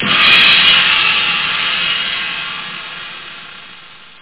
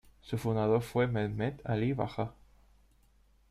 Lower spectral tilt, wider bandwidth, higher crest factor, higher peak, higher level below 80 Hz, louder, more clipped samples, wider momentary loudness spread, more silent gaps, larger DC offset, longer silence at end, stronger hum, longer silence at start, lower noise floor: second, -5 dB/octave vs -8 dB/octave; second, 4 kHz vs 14.5 kHz; about the same, 14 dB vs 18 dB; first, 0 dBFS vs -14 dBFS; first, -50 dBFS vs -58 dBFS; first, -9 LUFS vs -33 LUFS; neither; first, 22 LU vs 9 LU; neither; first, 0.4% vs under 0.1%; second, 0.3 s vs 1.2 s; neither; second, 0 s vs 0.25 s; second, -38 dBFS vs -65 dBFS